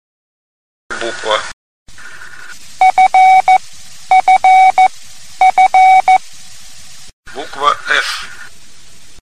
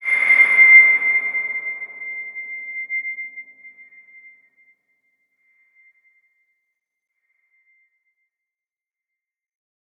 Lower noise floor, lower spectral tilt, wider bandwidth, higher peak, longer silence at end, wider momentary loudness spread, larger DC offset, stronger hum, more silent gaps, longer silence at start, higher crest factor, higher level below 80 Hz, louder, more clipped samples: second, -42 dBFS vs under -90 dBFS; about the same, -1 dB/octave vs -1 dB/octave; first, 13.5 kHz vs 11 kHz; about the same, 0 dBFS vs -2 dBFS; second, 0.8 s vs 6.3 s; about the same, 22 LU vs 22 LU; first, 3% vs under 0.1%; neither; first, 1.53-1.86 s, 7.13-7.23 s vs none; first, 0.9 s vs 0 s; second, 14 dB vs 20 dB; first, -48 dBFS vs -88 dBFS; first, -10 LUFS vs -13 LUFS; neither